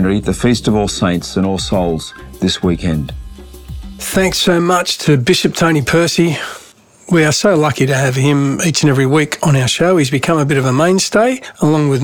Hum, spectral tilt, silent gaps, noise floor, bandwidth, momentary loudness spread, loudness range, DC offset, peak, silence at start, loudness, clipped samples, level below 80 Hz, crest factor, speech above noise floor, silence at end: none; -5 dB/octave; none; -39 dBFS; 19 kHz; 9 LU; 4 LU; under 0.1%; 0 dBFS; 0 s; -13 LUFS; under 0.1%; -36 dBFS; 12 dB; 26 dB; 0 s